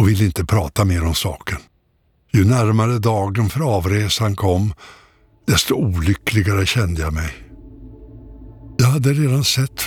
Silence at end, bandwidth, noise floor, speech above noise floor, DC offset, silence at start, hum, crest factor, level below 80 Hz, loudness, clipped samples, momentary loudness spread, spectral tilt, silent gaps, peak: 0 s; 18.5 kHz; -61 dBFS; 44 dB; under 0.1%; 0 s; none; 14 dB; -36 dBFS; -18 LUFS; under 0.1%; 11 LU; -5.5 dB/octave; none; -4 dBFS